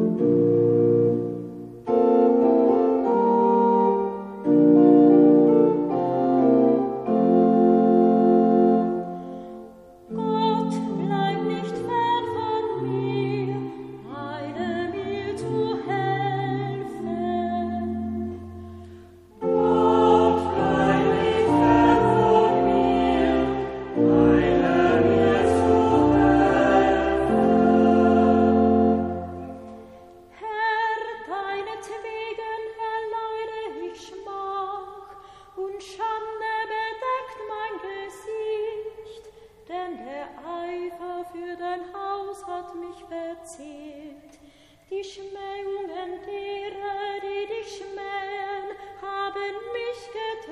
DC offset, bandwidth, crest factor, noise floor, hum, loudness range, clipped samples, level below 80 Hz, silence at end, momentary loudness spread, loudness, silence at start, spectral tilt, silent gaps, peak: under 0.1%; 11 kHz; 18 dB; -53 dBFS; none; 15 LU; under 0.1%; -48 dBFS; 0 s; 18 LU; -22 LUFS; 0 s; -7.5 dB/octave; none; -4 dBFS